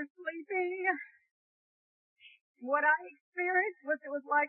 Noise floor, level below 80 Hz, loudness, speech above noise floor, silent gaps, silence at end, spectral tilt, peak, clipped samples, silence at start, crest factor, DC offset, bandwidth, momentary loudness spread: under -90 dBFS; under -90 dBFS; -32 LUFS; over 58 dB; 0.10-0.15 s, 1.31-2.16 s, 2.41-2.54 s, 3.21-3.32 s; 0 s; -6 dB/octave; -16 dBFS; under 0.1%; 0 s; 20 dB; under 0.1%; 4 kHz; 13 LU